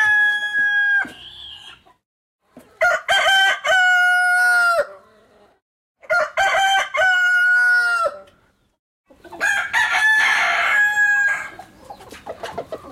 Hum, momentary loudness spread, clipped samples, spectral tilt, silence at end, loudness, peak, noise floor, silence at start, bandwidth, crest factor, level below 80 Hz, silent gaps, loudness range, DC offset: none; 17 LU; under 0.1%; 0.5 dB/octave; 0 s; -16 LUFS; -6 dBFS; -59 dBFS; 0 s; 16 kHz; 14 dB; -60 dBFS; 2.05-2.39 s, 5.62-5.95 s, 8.79-9.04 s; 2 LU; under 0.1%